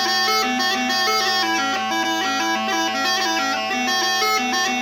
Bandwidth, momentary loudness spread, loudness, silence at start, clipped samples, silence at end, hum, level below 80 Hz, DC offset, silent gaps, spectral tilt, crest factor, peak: 19 kHz; 3 LU; -19 LUFS; 0 s; under 0.1%; 0 s; none; -78 dBFS; under 0.1%; none; -0.5 dB/octave; 14 dB; -6 dBFS